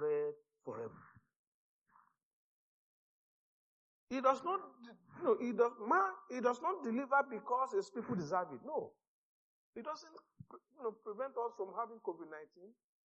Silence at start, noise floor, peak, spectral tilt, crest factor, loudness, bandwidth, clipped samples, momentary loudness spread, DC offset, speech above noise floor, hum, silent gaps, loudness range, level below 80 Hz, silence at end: 0 s; -72 dBFS; -18 dBFS; -5 dB/octave; 22 dB; -38 LUFS; 7.2 kHz; under 0.1%; 19 LU; under 0.1%; 34 dB; none; 1.36-1.86 s, 2.23-4.07 s, 9.07-9.73 s; 11 LU; -88 dBFS; 0.35 s